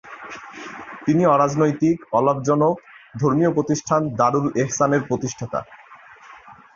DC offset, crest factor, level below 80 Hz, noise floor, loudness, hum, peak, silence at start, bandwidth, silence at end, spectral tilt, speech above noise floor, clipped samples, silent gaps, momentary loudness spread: under 0.1%; 18 dB; -58 dBFS; -45 dBFS; -20 LUFS; none; -4 dBFS; 0.05 s; 7.4 kHz; 0.25 s; -6.5 dB/octave; 26 dB; under 0.1%; none; 18 LU